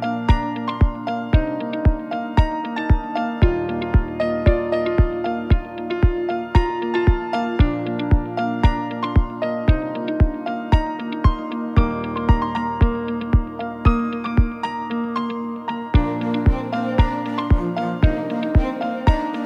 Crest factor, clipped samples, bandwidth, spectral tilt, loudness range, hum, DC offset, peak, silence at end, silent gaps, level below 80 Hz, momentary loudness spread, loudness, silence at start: 18 dB; under 0.1%; 7 kHz; -9 dB/octave; 1 LU; none; under 0.1%; -2 dBFS; 0 s; none; -24 dBFS; 5 LU; -21 LUFS; 0 s